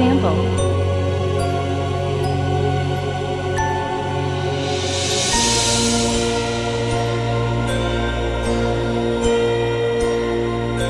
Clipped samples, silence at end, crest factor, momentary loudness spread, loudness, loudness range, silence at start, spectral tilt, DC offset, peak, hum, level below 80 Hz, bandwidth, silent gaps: under 0.1%; 0 s; 14 dB; 6 LU; -19 LUFS; 3 LU; 0 s; -4.5 dB/octave; under 0.1%; -4 dBFS; none; -32 dBFS; 12 kHz; none